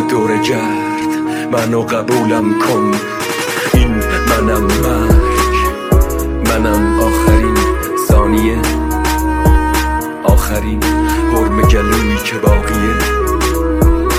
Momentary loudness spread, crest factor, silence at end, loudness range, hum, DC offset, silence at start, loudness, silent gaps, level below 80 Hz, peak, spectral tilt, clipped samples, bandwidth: 5 LU; 12 dB; 0 s; 2 LU; none; under 0.1%; 0 s; -13 LUFS; none; -16 dBFS; 0 dBFS; -5.5 dB/octave; under 0.1%; 16.5 kHz